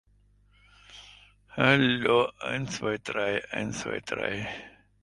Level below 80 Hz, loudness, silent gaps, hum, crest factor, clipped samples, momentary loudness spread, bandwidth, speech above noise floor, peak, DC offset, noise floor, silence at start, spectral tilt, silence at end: -60 dBFS; -27 LUFS; none; 50 Hz at -55 dBFS; 24 dB; under 0.1%; 19 LU; 11.5 kHz; 35 dB; -6 dBFS; under 0.1%; -62 dBFS; 0.9 s; -5 dB/octave; 0.35 s